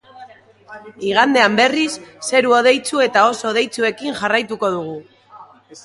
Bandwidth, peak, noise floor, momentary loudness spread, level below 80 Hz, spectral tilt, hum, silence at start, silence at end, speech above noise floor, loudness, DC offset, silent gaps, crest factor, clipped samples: 11.5 kHz; 0 dBFS; -43 dBFS; 12 LU; -64 dBFS; -3 dB/octave; none; 0.15 s; 0.05 s; 27 dB; -16 LUFS; under 0.1%; none; 18 dB; under 0.1%